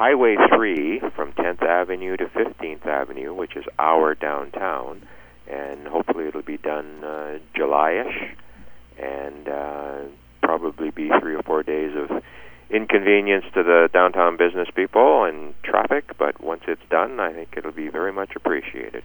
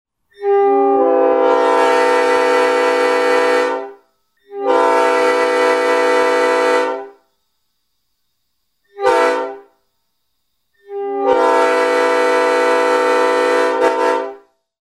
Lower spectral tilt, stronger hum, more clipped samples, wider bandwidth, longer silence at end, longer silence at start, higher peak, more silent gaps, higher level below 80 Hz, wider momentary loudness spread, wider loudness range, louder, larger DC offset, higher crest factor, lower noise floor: first, -6.5 dB/octave vs -2 dB/octave; neither; neither; first, over 20 kHz vs 12.5 kHz; second, 0 s vs 0.45 s; second, 0 s vs 0.4 s; about the same, 0 dBFS vs 0 dBFS; neither; first, -54 dBFS vs -62 dBFS; first, 16 LU vs 9 LU; about the same, 8 LU vs 8 LU; second, -21 LUFS vs -14 LUFS; neither; first, 22 dB vs 14 dB; second, -41 dBFS vs -71 dBFS